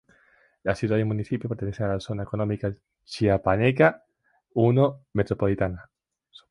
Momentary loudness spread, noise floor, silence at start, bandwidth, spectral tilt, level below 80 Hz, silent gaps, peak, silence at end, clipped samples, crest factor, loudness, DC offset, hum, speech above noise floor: 11 LU; -62 dBFS; 0.65 s; 11 kHz; -8 dB/octave; -48 dBFS; none; -4 dBFS; 0.65 s; under 0.1%; 20 dB; -25 LUFS; under 0.1%; none; 37 dB